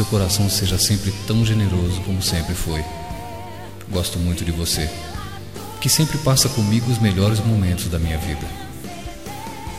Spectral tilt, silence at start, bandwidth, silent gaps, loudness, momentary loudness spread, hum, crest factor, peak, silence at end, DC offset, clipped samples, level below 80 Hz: -4.5 dB/octave; 0 s; 16 kHz; none; -20 LUFS; 16 LU; none; 18 dB; -2 dBFS; 0 s; 1%; under 0.1%; -36 dBFS